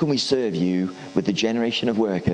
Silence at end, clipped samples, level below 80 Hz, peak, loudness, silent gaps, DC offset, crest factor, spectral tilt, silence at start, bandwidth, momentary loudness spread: 0 s; under 0.1%; -56 dBFS; -6 dBFS; -23 LUFS; none; under 0.1%; 16 dB; -5.5 dB/octave; 0 s; 10 kHz; 4 LU